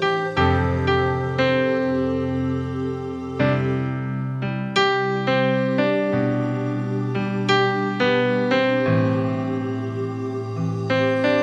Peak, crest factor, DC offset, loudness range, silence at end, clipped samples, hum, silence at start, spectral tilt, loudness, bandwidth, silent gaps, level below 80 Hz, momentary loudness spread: -6 dBFS; 16 dB; under 0.1%; 2 LU; 0 s; under 0.1%; none; 0 s; -7 dB/octave; -22 LUFS; 8 kHz; none; -46 dBFS; 7 LU